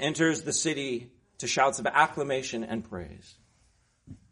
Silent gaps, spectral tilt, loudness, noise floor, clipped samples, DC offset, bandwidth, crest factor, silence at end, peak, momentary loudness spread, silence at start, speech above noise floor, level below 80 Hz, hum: none; -3 dB/octave; -28 LUFS; -67 dBFS; under 0.1%; under 0.1%; 10.5 kHz; 24 dB; 0.15 s; -6 dBFS; 13 LU; 0 s; 38 dB; -60 dBFS; none